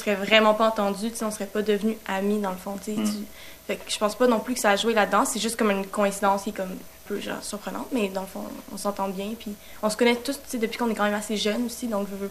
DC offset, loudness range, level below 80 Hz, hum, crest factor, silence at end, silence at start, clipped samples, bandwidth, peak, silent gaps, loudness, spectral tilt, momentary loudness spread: 0.3%; 6 LU; -56 dBFS; none; 24 dB; 0 s; 0 s; under 0.1%; 14.5 kHz; -2 dBFS; none; -25 LUFS; -3.5 dB/octave; 12 LU